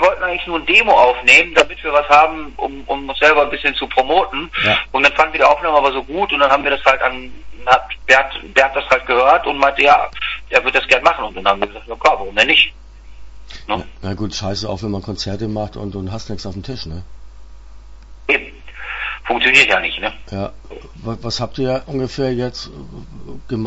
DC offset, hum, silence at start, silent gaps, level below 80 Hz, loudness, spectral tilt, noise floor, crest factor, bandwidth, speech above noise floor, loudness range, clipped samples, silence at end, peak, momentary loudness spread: under 0.1%; none; 0 s; none; -38 dBFS; -15 LUFS; -4 dB/octave; -36 dBFS; 16 dB; 11 kHz; 20 dB; 12 LU; under 0.1%; 0 s; 0 dBFS; 16 LU